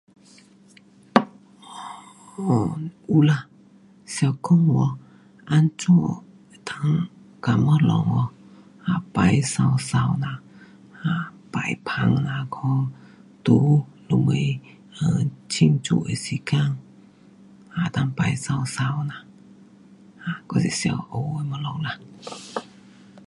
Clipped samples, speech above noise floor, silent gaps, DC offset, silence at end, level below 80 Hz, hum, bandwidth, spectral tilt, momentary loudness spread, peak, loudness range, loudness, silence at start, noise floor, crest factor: under 0.1%; 31 dB; none; under 0.1%; 0.65 s; -54 dBFS; none; 11.5 kHz; -6.5 dB/octave; 16 LU; 0 dBFS; 6 LU; -23 LUFS; 1.15 s; -52 dBFS; 24 dB